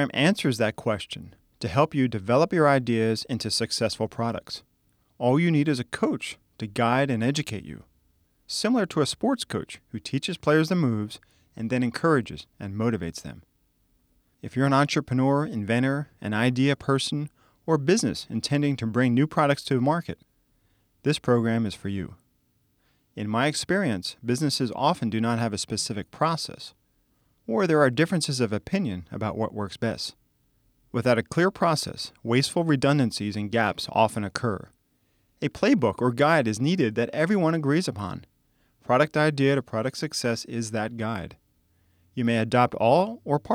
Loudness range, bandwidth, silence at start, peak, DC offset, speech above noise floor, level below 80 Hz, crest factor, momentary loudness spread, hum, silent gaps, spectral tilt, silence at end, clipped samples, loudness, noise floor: 4 LU; 15.5 kHz; 0 s; -6 dBFS; under 0.1%; 44 dB; -60 dBFS; 20 dB; 13 LU; none; none; -5.5 dB/octave; 0 s; under 0.1%; -25 LUFS; -68 dBFS